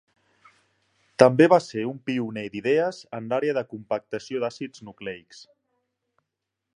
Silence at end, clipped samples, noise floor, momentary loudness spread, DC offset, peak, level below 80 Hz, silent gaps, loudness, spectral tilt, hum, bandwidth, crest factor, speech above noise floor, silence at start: 1.55 s; under 0.1%; -83 dBFS; 19 LU; under 0.1%; 0 dBFS; -70 dBFS; none; -23 LUFS; -6.5 dB/octave; none; 10.5 kHz; 26 dB; 60 dB; 1.2 s